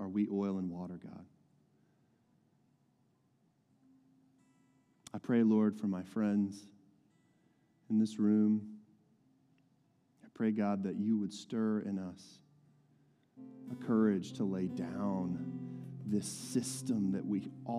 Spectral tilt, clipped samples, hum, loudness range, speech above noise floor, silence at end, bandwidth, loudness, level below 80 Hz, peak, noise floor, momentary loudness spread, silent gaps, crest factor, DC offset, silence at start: -6.5 dB/octave; under 0.1%; none; 4 LU; 40 dB; 0 s; 12.5 kHz; -35 LUFS; -82 dBFS; -20 dBFS; -74 dBFS; 17 LU; none; 18 dB; under 0.1%; 0 s